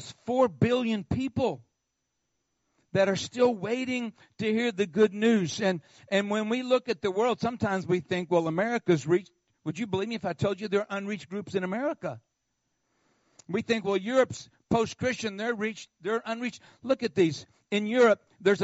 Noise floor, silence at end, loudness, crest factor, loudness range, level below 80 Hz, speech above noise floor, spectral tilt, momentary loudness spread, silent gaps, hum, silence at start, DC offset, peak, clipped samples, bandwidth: -80 dBFS; 0 s; -28 LUFS; 18 dB; 5 LU; -62 dBFS; 53 dB; -4.5 dB/octave; 9 LU; none; none; 0 s; under 0.1%; -10 dBFS; under 0.1%; 8 kHz